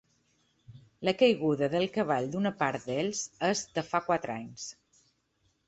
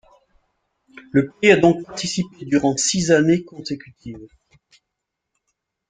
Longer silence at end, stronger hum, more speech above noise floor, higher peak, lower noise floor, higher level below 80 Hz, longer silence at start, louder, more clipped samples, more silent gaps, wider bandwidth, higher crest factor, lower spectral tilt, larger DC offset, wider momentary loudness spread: second, 0.95 s vs 1.65 s; neither; second, 44 dB vs 61 dB; second, -12 dBFS vs -2 dBFS; second, -74 dBFS vs -80 dBFS; second, -68 dBFS vs -56 dBFS; second, 0.7 s vs 1.15 s; second, -30 LUFS vs -18 LUFS; neither; neither; second, 8.2 kHz vs 9.6 kHz; about the same, 20 dB vs 20 dB; about the same, -4.5 dB/octave vs -4.5 dB/octave; neither; second, 13 LU vs 21 LU